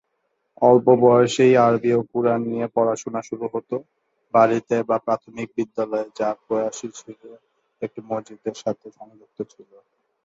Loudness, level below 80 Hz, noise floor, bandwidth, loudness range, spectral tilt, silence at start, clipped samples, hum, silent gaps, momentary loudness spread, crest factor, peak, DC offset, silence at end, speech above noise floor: -21 LUFS; -66 dBFS; -73 dBFS; 7.8 kHz; 12 LU; -6 dB/octave; 0.6 s; under 0.1%; none; none; 19 LU; 20 dB; -2 dBFS; under 0.1%; 0.8 s; 52 dB